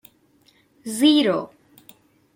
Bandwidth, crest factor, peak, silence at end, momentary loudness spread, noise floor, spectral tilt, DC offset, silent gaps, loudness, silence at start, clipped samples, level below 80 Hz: 16.5 kHz; 18 dB; -6 dBFS; 0.9 s; 22 LU; -59 dBFS; -4 dB/octave; under 0.1%; none; -19 LUFS; 0.85 s; under 0.1%; -72 dBFS